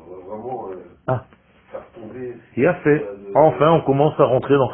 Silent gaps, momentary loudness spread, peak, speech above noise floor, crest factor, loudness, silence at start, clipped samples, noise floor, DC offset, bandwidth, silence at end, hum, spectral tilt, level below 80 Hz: none; 20 LU; 0 dBFS; 22 dB; 18 dB; -18 LUFS; 0.05 s; under 0.1%; -39 dBFS; under 0.1%; 3.9 kHz; 0 s; none; -12.5 dB/octave; -52 dBFS